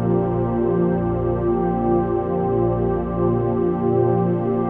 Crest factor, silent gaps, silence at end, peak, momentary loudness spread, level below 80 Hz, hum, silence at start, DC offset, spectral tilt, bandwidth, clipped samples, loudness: 12 dB; none; 0 s; -8 dBFS; 2 LU; -36 dBFS; 60 Hz at -60 dBFS; 0 s; under 0.1%; -12.5 dB/octave; 3.4 kHz; under 0.1%; -20 LUFS